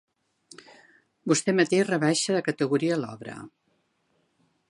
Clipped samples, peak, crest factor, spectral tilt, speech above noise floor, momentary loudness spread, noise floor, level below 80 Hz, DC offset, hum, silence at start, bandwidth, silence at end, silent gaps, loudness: under 0.1%; -10 dBFS; 18 dB; -4.5 dB/octave; 47 dB; 17 LU; -72 dBFS; -74 dBFS; under 0.1%; none; 1.25 s; 11.5 kHz; 1.2 s; none; -24 LUFS